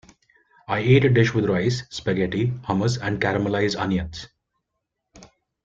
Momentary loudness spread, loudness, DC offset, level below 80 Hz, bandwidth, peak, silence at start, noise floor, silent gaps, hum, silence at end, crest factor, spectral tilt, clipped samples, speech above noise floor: 10 LU; -22 LUFS; under 0.1%; -50 dBFS; 7.8 kHz; -4 dBFS; 0.7 s; -80 dBFS; none; none; 0.4 s; 18 dB; -6.5 dB/octave; under 0.1%; 59 dB